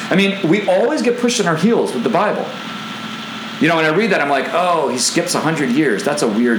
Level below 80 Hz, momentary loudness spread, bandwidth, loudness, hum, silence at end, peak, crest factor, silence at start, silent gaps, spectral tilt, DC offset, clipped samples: -68 dBFS; 12 LU; over 20 kHz; -16 LUFS; none; 0 s; -2 dBFS; 14 dB; 0 s; none; -4 dB/octave; under 0.1%; under 0.1%